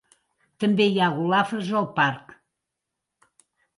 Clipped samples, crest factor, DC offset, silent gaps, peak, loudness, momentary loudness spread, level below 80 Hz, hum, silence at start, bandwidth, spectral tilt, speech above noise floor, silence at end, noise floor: under 0.1%; 18 dB; under 0.1%; none; -8 dBFS; -23 LUFS; 6 LU; -72 dBFS; none; 0.6 s; 11.5 kHz; -6.5 dB/octave; 61 dB; 1.55 s; -83 dBFS